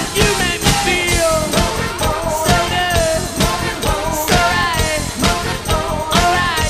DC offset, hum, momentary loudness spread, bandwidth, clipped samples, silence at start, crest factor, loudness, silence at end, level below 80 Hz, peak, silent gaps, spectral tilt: under 0.1%; none; 5 LU; 15.5 kHz; under 0.1%; 0 s; 16 dB; -15 LUFS; 0 s; -26 dBFS; 0 dBFS; none; -3.5 dB/octave